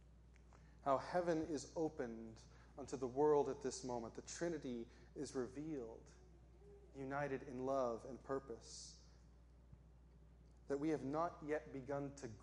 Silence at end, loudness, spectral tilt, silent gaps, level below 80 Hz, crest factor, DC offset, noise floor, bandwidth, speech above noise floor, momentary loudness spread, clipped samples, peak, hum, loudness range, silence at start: 0 s; -44 LUFS; -5.5 dB/octave; none; -66 dBFS; 20 dB; under 0.1%; -65 dBFS; 11 kHz; 21 dB; 17 LU; under 0.1%; -24 dBFS; none; 7 LU; 0 s